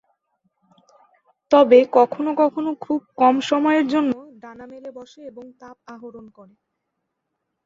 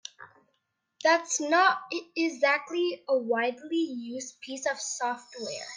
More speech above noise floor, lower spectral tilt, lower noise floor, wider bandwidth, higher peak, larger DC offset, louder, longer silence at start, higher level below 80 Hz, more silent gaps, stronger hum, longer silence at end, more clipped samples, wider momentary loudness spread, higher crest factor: first, 58 dB vs 50 dB; first, -5 dB/octave vs -1.5 dB/octave; about the same, -78 dBFS vs -78 dBFS; second, 7.6 kHz vs 10 kHz; first, -2 dBFS vs -10 dBFS; neither; first, -18 LUFS vs -28 LUFS; first, 1.5 s vs 0.2 s; first, -68 dBFS vs -86 dBFS; neither; neither; first, 1.45 s vs 0 s; neither; first, 26 LU vs 13 LU; about the same, 20 dB vs 20 dB